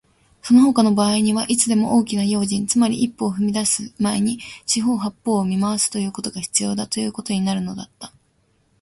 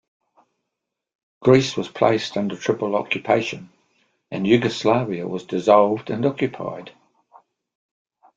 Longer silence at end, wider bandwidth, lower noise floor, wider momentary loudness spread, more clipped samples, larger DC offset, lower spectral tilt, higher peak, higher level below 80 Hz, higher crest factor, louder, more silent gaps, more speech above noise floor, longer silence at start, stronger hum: second, 0.75 s vs 1.5 s; first, 11.5 kHz vs 7.8 kHz; second, -63 dBFS vs -82 dBFS; second, 10 LU vs 13 LU; neither; neither; second, -4 dB/octave vs -6 dB/octave; about the same, -2 dBFS vs -2 dBFS; first, -56 dBFS vs -62 dBFS; about the same, 18 dB vs 20 dB; about the same, -19 LUFS vs -21 LUFS; neither; second, 43 dB vs 62 dB; second, 0.45 s vs 1.4 s; neither